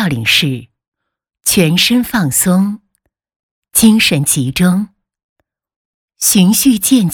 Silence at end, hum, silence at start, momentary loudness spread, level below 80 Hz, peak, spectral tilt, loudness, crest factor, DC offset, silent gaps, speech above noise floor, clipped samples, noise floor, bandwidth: 0 s; none; 0 s; 10 LU; -44 dBFS; 0 dBFS; -3.5 dB/octave; -11 LUFS; 14 dB; under 0.1%; 0.88-0.92 s, 3.36-3.62 s, 5.24-5.36 s, 5.76-6.08 s; 55 dB; under 0.1%; -66 dBFS; 20 kHz